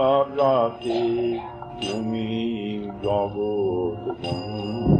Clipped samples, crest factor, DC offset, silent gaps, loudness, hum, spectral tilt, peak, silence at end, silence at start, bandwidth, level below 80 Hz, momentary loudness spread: under 0.1%; 18 dB; under 0.1%; none; -25 LUFS; none; -7.5 dB/octave; -6 dBFS; 0 s; 0 s; 9.2 kHz; -44 dBFS; 9 LU